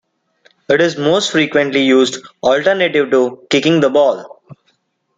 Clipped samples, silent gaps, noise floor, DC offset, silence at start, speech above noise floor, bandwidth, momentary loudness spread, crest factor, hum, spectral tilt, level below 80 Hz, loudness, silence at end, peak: under 0.1%; none; -62 dBFS; under 0.1%; 0.7 s; 49 dB; 9.2 kHz; 4 LU; 14 dB; none; -4.5 dB/octave; -58 dBFS; -14 LUFS; 0.9 s; -2 dBFS